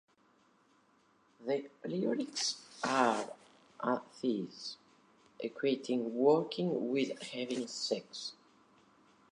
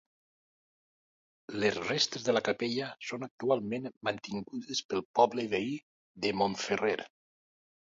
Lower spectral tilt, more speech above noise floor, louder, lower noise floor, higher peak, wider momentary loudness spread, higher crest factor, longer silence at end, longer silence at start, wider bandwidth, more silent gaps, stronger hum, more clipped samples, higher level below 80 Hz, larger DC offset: about the same, -4 dB/octave vs -4 dB/octave; second, 35 dB vs over 58 dB; second, -35 LUFS vs -32 LUFS; second, -70 dBFS vs under -90 dBFS; about the same, -12 dBFS vs -10 dBFS; first, 14 LU vs 11 LU; about the same, 24 dB vs 24 dB; first, 1 s vs 0.85 s; about the same, 1.4 s vs 1.5 s; first, 11 kHz vs 7.8 kHz; second, none vs 3.31-3.38 s, 3.97-4.01 s, 4.85-4.89 s, 5.05-5.14 s, 5.83-6.15 s; neither; neither; second, -88 dBFS vs -72 dBFS; neither